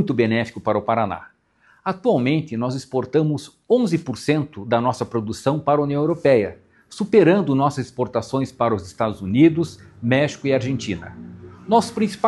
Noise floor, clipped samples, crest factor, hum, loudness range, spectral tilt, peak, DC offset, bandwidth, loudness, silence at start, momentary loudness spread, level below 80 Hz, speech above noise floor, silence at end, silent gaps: -58 dBFS; under 0.1%; 18 dB; none; 3 LU; -7 dB/octave; -2 dBFS; under 0.1%; 12 kHz; -21 LUFS; 0 s; 13 LU; -56 dBFS; 38 dB; 0 s; none